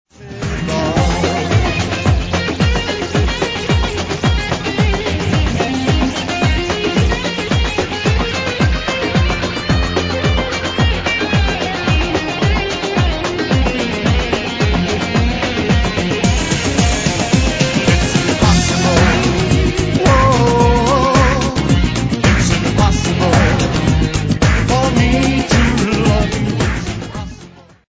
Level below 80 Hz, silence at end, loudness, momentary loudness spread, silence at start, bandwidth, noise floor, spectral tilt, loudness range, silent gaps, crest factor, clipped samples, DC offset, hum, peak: -22 dBFS; 0.3 s; -15 LUFS; 6 LU; 0.2 s; 8 kHz; -39 dBFS; -5 dB/octave; 4 LU; none; 14 dB; under 0.1%; under 0.1%; none; 0 dBFS